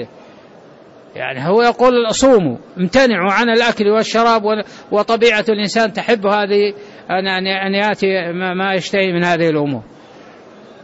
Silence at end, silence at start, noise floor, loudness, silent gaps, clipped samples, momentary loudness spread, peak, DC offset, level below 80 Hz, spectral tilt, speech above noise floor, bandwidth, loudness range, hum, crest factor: 0.55 s; 0 s; -42 dBFS; -15 LUFS; none; under 0.1%; 9 LU; -2 dBFS; under 0.1%; -50 dBFS; -4.5 dB/octave; 27 dB; 8 kHz; 3 LU; none; 12 dB